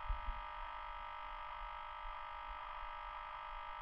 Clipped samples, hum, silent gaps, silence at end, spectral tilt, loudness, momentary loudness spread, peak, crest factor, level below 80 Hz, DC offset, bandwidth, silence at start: under 0.1%; none; none; 0 s; -5 dB/octave; -48 LUFS; 1 LU; -28 dBFS; 18 dB; -52 dBFS; under 0.1%; 5.8 kHz; 0 s